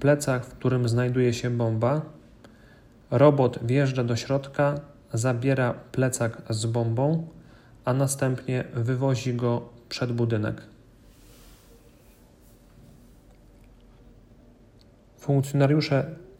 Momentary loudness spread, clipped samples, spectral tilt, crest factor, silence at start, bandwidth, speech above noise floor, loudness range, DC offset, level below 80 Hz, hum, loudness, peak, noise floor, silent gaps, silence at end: 9 LU; under 0.1%; -6.5 dB/octave; 22 dB; 0 s; 15.5 kHz; 30 dB; 9 LU; under 0.1%; -56 dBFS; none; -25 LUFS; -4 dBFS; -55 dBFS; none; 0.15 s